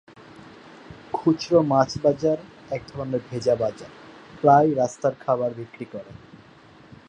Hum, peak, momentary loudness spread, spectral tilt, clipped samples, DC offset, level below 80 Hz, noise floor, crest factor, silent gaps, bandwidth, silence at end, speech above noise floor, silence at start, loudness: none; -4 dBFS; 21 LU; -6.5 dB/octave; under 0.1%; under 0.1%; -58 dBFS; -50 dBFS; 22 dB; none; 9.8 kHz; 0.95 s; 28 dB; 0.9 s; -23 LUFS